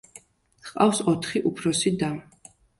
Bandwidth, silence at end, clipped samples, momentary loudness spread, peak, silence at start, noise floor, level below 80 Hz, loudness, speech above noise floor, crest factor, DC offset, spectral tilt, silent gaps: 11.5 kHz; 0.6 s; under 0.1%; 16 LU; -6 dBFS; 0.15 s; -53 dBFS; -60 dBFS; -24 LUFS; 29 dB; 20 dB; under 0.1%; -4.5 dB/octave; none